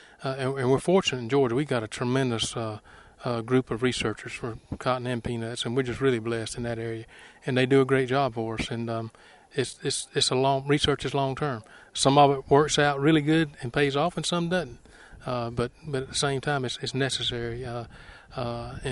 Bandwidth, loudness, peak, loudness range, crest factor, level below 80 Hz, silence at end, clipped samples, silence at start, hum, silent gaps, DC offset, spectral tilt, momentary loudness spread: 11.5 kHz; -26 LUFS; -6 dBFS; 6 LU; 22 dB; -52 dBFS; 0 s; under 0.1%; 0.2 s; none; none; under 0.1%; -5 dB/octave; 13 LU